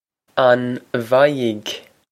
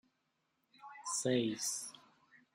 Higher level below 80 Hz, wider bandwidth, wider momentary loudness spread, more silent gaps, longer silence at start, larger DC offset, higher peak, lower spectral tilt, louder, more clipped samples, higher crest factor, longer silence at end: first, -68 dBFS vs -86 dBFS; about the same, 15 kHz vs 16 kHz; second, 12 LU vs 19 LU; neither; second, 0.35 s vs 0.8 s; neither; first, 0 dBFS vs -22 dBFS; first, -5.5 dB/octave vs -3.5 dB/octave; first, -18 LUFS vs -37 LUFS; neither; about the same, 18 dB vs 20 dB; about the same, 0.3 s vs 0.2 s